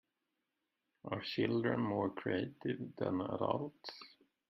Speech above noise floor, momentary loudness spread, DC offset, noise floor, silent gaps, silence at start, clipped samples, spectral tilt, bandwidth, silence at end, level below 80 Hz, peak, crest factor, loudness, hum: 49 dB; 15 LU; under 0.1%; -87 dBFS; none; 1.05 s; under 0.1%; -8 dB/octave; 6 kHz; 0.45 s; -76 dBFS; -18 dBFS; 20 dB; -38 LUFS; none